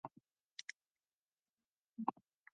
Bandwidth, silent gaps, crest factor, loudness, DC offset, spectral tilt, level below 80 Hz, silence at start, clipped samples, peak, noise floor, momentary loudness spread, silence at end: 6.6 kHz; 0.51-0.56 s, 0.64-0.68 s, 0.76-0.80 s, 0.91-0.95 s, 1.14-1.27 s, 1.50-1.54 s, 1.67-1.85 s; 32 dB; -49 LUFS; under 0.1%; -3 dB/octave; under -90 dBFS; 0.05 s; under 0.1%; -20 dBFS; under -90 dBFS; 20 LU; 0.45 s